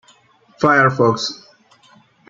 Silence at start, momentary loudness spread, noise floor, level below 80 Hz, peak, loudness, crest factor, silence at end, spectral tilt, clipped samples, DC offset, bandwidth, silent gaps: 0.6 s; 12 LU; -53 dBFS; -60 dBFS; -2 dBFS; -16 LUFS; 18 dB; 0.95 s; -5 dB/octave; under 0.1%; under 0.1%; 7.6 kHz; none